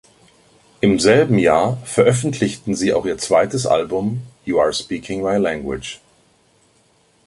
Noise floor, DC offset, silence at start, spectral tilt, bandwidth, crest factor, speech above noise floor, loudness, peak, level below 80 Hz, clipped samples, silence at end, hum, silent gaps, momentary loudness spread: -57 dBFS; under 0.1%; 0.85 s; -5 dB/octave; 11.5 kHz; 18 dB; 40 dB; -18 LUFS; -2 dBFS; -48 dBFS; under 0.1%; 1.3 s; none; none; 12 LU